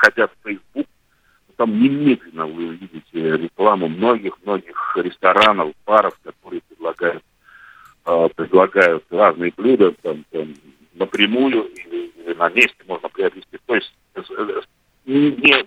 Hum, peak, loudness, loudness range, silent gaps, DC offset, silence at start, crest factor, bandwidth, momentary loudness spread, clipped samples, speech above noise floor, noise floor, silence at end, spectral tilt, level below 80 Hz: none; 0 dBFS; -18 LUFS; 4 LU; none; under 0.1%; 0 s; 18 dB; 13.5 kHz; 16 LU; under 0.1%; 42 dB; -60 dBFS; 0 s; -5.5 dB/octave; -62 dBFS